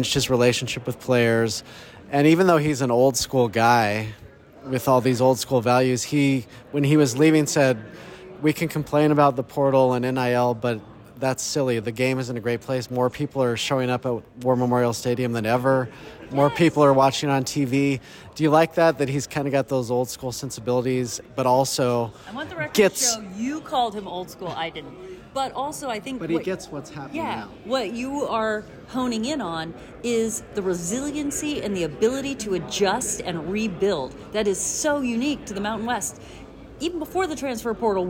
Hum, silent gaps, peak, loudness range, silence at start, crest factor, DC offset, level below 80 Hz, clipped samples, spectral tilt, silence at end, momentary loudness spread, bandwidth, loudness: none; none; -6 dBFS; 7 LU; 0 s; 16 dB; under 0.1%; -54 dBFS; under 0.1%; -5 dB/octave; 0 s; 12 LU; over 20 kHz; -23 LUFS